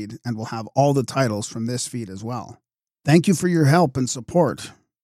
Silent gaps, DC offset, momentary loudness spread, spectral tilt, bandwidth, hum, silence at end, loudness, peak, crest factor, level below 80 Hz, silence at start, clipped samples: none; under 0.1%; 14 LU; -6 dB/octave; 15 kHz; none; 0.3 s; -21 LUFS; -4 dBFS; 18 dB; -58 dBFS; 0 s; under 0.1%